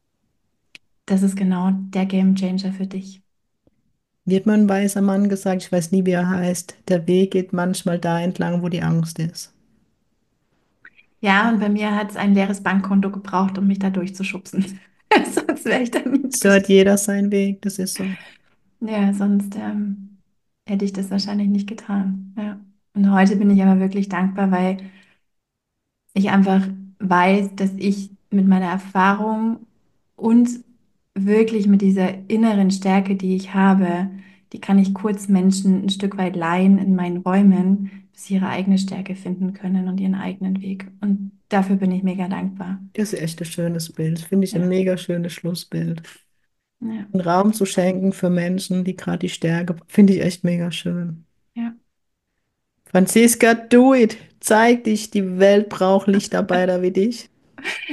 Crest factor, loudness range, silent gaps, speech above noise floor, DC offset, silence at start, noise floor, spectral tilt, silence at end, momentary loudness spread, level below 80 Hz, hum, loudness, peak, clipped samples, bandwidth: 18 dB; 6 LU; none; 60 dB; under 0.1%; 1.1 s; -78 dBFS; -6 dB/octave; 0 s; 12 LU; -64 dBFS; none; -19 LUFS; -2 dBFS; under 0.1%; 12.5 kHz